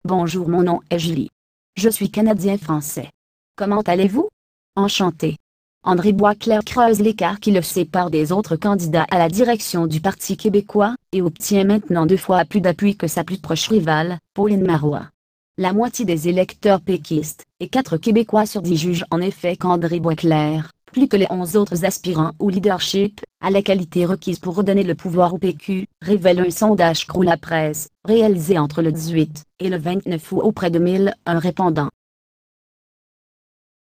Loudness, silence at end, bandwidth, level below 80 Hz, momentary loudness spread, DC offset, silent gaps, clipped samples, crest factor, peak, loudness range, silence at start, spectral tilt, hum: -19 LUFS; 2.05 s; 15.5 kHz; -52 dBFS; 8 LU; under 0.1%; 1.32-1.73 s, 3.14-3.54 s, 4.33-4.73 s, 5.40-5.81 s, 15.14-15.54 s; under 0.1%; 16 dB; -2 dBFS; 3 LU; 0.05 s; -6 dB/octave; none